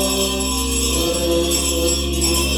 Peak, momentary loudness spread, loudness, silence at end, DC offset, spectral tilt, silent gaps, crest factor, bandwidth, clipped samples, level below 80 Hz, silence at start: -6 dBFS; 2 LU; -18 LUFS; 0 s; under 0.1%; -3 dB/octave; none; 14 dB; over 20 kHz; under 0.1%; -26 dBFS; 0 s